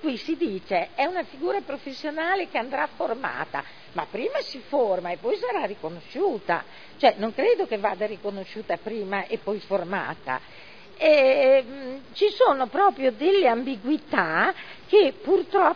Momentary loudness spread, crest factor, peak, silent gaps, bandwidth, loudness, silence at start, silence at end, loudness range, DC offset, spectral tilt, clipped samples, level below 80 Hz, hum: 13 LU; 20 dB; -4 dBFS; none; 5.4 kHz; -24 LUFS; 0 s; 0 s; 7 LU; 0.4%; -6 dB/octave; under 0.1%; -66 dBFS; none